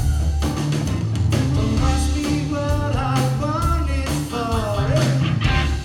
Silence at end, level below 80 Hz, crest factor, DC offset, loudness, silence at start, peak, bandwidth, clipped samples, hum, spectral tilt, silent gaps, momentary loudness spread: 0 s; -24 dBFS; 16 dB; under 0.1%; -21 LUFS; 0 s; -4 dBFS; 16 kHz; under 0.1%; none; -6 dB/octave; none; 3 LU